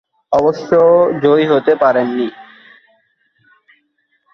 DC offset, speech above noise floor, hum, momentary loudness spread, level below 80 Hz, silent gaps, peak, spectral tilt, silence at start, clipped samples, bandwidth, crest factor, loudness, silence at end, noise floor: under 0.1%; 51 dB; none; 8 LU; -56 dBFS; none; 0 dBFS; -7.5 dB/octave; 0.3 s; under 0.1%; 6.4 kHz; 14 dB; -13 LUFS; 1.9 s; -63 dBFS